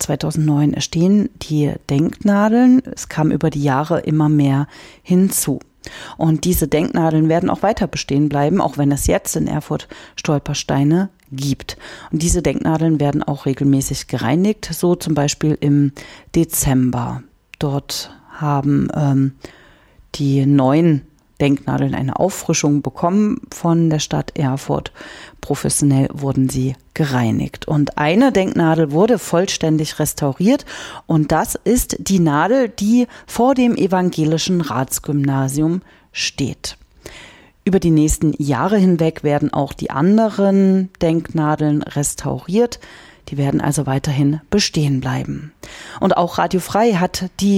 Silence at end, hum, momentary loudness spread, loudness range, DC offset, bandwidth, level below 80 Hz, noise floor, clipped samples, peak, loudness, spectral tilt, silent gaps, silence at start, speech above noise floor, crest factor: 0 s; none; 10 LU; 3 LU; under 0.1%; 16.5 kHz; -38 dBFS; -48 dBFS; under 0.1%; -4 dBFS; -17 LUFS; -6 dB/octave; none; 0 s; 31 dB; 14 dB